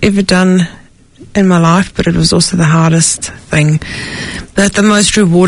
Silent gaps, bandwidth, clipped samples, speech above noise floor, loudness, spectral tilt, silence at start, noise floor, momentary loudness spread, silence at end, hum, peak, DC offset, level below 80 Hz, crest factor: none; 11 kHz; 0.3%; 28 dB; -10 LUFS; -4.5 dB/octave; 0 s; -38 dBFS; 10 LU; 0 s; none; 0 dBFS; under 0.1%; -32 dBFS; 10 dB